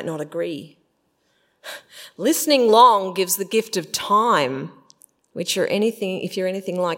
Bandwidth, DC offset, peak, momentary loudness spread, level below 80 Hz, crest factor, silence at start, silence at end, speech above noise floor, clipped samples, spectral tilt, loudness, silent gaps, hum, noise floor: 16.5 kHz; under 0.1%; 0 dBFS; 23 LU; -74 dBFS; 20 dB; 0 s; 0 s; 47 dB; under 0.1%; -3.5 dB/octave; -20 LUFS; none; none; -67 dBFS